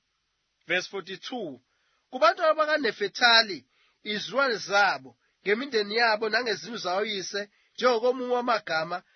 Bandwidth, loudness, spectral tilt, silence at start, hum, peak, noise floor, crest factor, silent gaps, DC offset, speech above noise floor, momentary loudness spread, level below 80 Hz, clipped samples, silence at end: 6.6 kHz; -25 LUFS; -2.5 dB/octave; 0.7 s; none; -6 dBFS; -76 dBFS; 22 dB; none; under 0.1%; 50 dB; 14 LU; -84 dBFS; under 0.1%; 0.15 s